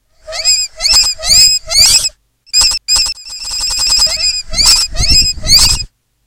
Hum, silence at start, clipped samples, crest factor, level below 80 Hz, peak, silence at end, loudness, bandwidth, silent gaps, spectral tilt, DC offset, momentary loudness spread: none; 0.25 s; 0.5%; 12 dB; -24 dBFS; 0 dBFS; 0.4 s; -8 LUFS; over 20 kHz; none; 0.5 dB/octave; under 0.1%; 10 LU